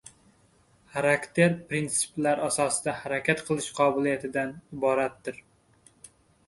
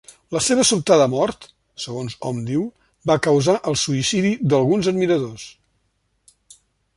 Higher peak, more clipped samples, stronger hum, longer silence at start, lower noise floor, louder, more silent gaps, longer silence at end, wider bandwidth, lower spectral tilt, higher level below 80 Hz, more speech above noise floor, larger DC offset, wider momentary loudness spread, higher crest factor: second, -6 dBFS vs -2 dBFS; neither; neither; first, 0.95 s vs 0.3 s; second, -62 dBFS vs -68 dBFS; second, -27 LUFS vs -19 LUFS; neither; second, 1.1 s vs 1.45 s; about the same, 12 kHz vs 11.5 kHz; about the same, -4 dB/octave vs -4.5 dB/octave; second, -64 dBFS vs -54 dBFS; second, 36 dB vs 49 dB; neither; second, 9 LU vs 15 LU; about the same, 22 dB vs 18 dB